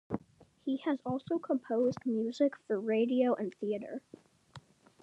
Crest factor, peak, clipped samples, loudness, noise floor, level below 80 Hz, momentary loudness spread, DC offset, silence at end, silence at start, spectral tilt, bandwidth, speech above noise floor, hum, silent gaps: 16 dB; -18 dBFS; under 0.1%; -33 LUFS; -62 dBFS; -76 dBFS; 12 LU; under 0.1%; 0.45 s; 0.1 s; -7.5 dB/octave; 8.6 kHz; 29 dB; none; none